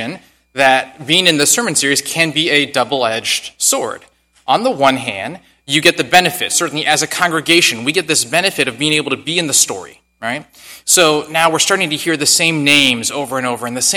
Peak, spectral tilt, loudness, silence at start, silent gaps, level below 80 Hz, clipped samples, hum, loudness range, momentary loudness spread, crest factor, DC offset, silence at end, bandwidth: 0 dBFS; -2 dB/octave; -13 LUFS; 0 s; none; -56 dBFS; 0.3%; none; 3 LU; 13 LU; 16 dB; under 0.1%; 0 s; over 20 kHz